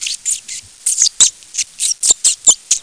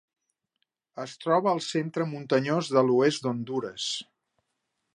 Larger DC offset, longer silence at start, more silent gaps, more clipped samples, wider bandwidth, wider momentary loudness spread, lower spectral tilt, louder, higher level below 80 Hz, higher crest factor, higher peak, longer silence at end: first, 0.2% vs under 0.1%; second, 0 s vs 0.95 s; neither; neither; about the same, 11 kHz vs 11 kHz; about the same, 12 LU vs 12 LU; second, 3 dB/octave vs -5 dB/octave; first, -12 LUFS vs -27 LUFS; first, -56 dBFS vs -78 dBFS; second, 16 dB vs 22 dB; first, 0 dBFS vs -8 dBFS; second, 0 s vs 0.95 s